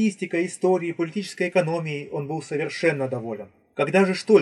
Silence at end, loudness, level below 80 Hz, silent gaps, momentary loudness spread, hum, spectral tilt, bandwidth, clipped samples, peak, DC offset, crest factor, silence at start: 0 s; -24 LUFS; -78 dBFS; none; 10 LU; none; -6 dB/octave; 11.5 kHz; under 0.1%; -4 dBFS; under 0.1%; 20 dB; 0 s